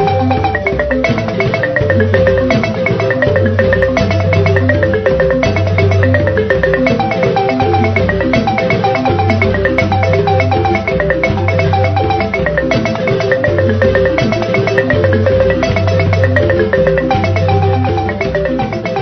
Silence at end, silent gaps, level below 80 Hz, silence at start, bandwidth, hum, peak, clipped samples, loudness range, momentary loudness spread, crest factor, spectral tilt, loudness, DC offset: 0 s; none; -30 dBFS; 0 s; 6.4 kHz; none; 0 dBFS; under 0.1%; 1 LU; 3 LU; 12 dB; -7.5 dB/octave; -12 LUFS; under 0.1%